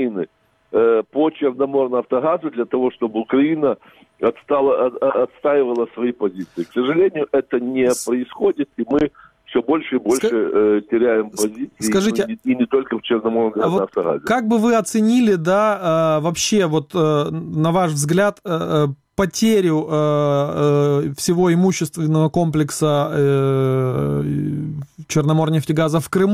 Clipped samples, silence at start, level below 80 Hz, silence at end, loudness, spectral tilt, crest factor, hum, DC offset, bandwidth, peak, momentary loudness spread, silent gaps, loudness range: under 0.1%; 0 s; -52 dBFS; 0 s; -18 LUFS; -6 dB/octave; 14 dB; none; under 0.1%; 16 kHz; -4 dBFS; 6 LU; none; 3 LU